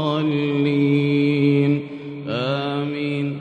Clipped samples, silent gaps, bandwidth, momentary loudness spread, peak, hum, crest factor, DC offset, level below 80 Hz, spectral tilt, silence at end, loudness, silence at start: under 0.1%; none; 5.4 kHz; 8 LU; -6 dBFS; none; 14 dB; under 0.1%; -66 dBFS; -8.5 dB/octave; 0 s; -20 LUFS; 0 s